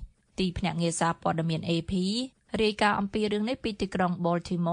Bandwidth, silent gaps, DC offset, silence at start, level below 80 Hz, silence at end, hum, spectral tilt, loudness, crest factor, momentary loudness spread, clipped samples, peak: 10.5 kHz; none; under 0.1%; 0 s; -50 dBFS; 0 s; none; -5.5 dB/octave; -28 LUFS; 20 dB; 6 LU; under 0.1%; -8 dBFS